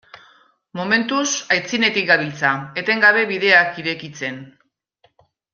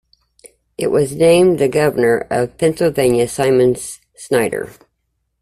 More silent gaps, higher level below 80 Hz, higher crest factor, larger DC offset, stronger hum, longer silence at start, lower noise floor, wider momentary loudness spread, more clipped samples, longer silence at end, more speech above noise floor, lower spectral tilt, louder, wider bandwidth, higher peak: neither; second, -66 dBFS vs -48 dBFS; about the same, 18 dB vs 14 dB; neither; neither; second, 0.15 s vs 0.8 s; second, -62 dBFS vs -70 dBFS; about the same, 15 LU vs 14 LU; neither; first, 1.1 s vs 0.7 s; second, 43 dB vs 55 dB; second, -2.5 dB/octave vs -5.5 dB/octave; about the same, -17 LUFS vs -15 LUFS; second, 7.4 kHz vs 14.5 kHz; about the same, -2 dBFS vs -2 dBFS